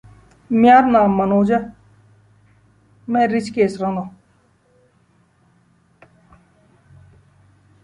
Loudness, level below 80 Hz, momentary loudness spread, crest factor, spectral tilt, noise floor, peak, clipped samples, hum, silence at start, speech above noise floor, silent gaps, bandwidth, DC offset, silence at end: -16 LUFS; -54 dBFS; 18 LU; 18 dB; -7.5 dB/octave; -58 dBFS; -2 dBFS; under 0.1%; none; 0.5 s; 43 dB; none; 10.5 kHz; under 0.1%; 3.75 s